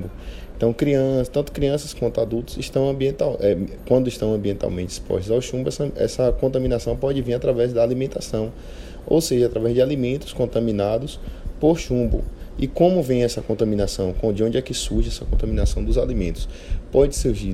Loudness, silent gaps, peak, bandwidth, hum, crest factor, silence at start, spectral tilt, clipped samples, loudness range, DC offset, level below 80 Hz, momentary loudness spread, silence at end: -22 LUFS; none; -2 dBFS; 15.5 kHz; none; 18 dB; 0 s; -6.5 dB/octave; under 0.1%; 1 LU; under 0.1%; -30 dBFS; 9 LU; 0 s